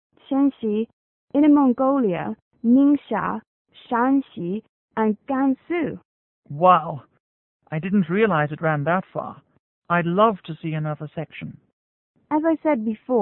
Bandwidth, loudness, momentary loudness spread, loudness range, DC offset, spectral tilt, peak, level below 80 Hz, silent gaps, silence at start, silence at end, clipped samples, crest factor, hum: 3.9 kHz; -22 LUFS; 16 LU; 5 LU; under 0.1%; -12 dB/octave; -2 dBFS; -64 dBFS; 0.93-1.28 s, 2.42-2.51 s, 3.47-3.65 s, 4.69-4.88 s, 6.05-6.43 s, 7.20-7.60 s, 9.59-9.82 s, 11.73-12.14 s; 0.3 s; 0 s; under 0.1%; 20 dB; none